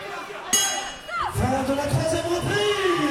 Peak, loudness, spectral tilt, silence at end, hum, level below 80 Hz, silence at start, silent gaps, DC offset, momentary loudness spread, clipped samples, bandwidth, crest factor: -6 dBFS; -23 LUFS; -3.5 dB/octave; 0 s; none; -44 dBFS; 0 s; none; under 0.1%; 9 LU; under 0.1%; 16.5 kHz; 18 dB